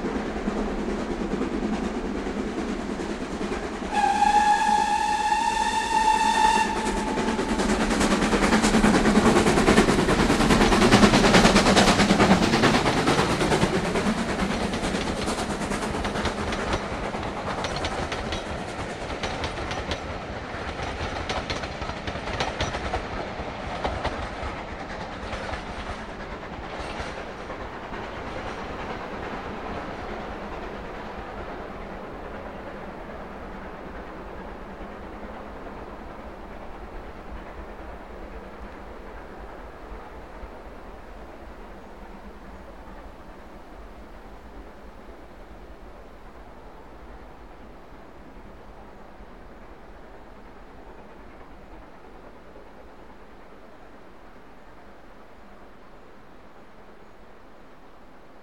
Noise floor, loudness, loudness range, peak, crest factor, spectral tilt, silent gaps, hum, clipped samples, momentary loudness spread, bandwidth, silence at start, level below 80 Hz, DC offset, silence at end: -49 dBFS; -24 LUFS; 27 LU; -2 dBFS; 24 dB; -4.5 dB/octave; none; none; under 0.1%; 27 LU; 14 kHz; 0 s; -40 dBFS; 0.3%; 0 s